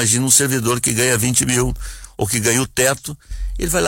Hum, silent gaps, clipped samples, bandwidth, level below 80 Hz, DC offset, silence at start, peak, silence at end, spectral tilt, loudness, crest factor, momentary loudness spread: none; none; under 0.1%; 16.5 kHz; -32 dBFS; under 0.1%; 0 s; -2 dBFS; 0 s; -3 dB/octave; -16 LUFS; 16 dB; 18 LU